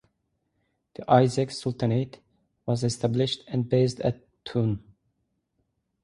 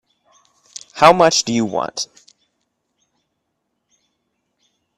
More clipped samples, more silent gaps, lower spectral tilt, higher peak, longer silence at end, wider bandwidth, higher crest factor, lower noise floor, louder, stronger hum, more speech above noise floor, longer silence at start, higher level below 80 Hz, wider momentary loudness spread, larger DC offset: neither; neither; first, -6.5 dB/octave vs -3 dB/octave; second, -4 dBFS vs 0 dBFS; second, 1.25 s vs 2.95 s; second, 11.5 kHz vs 13.5 kHz; about the same, 24 dB vs 20 dB; about the same, -76 dBFS vs -73 dBFS; second, -26 LUFS vs -15 LUFS; neither; second, 51 dB vs 59 dB; about the same, 1 s vs 0.95 s; about the same, -58 dBFS vs -58 dBFS; second, 16 LU vs 24 LU; neither